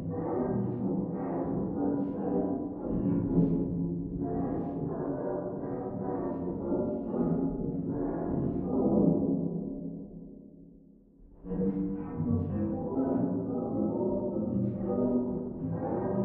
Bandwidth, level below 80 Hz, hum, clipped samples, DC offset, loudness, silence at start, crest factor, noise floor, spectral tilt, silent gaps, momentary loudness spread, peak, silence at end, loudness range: 2.7 kHz; -50 dBFS; none; under 0.1%; under 0.1%; -32 LUFS; 0 s; 18 dB; -56 dBFS; -13 dB/octave; none; 7 LU; -12 dBFS; 0 s; 3 LU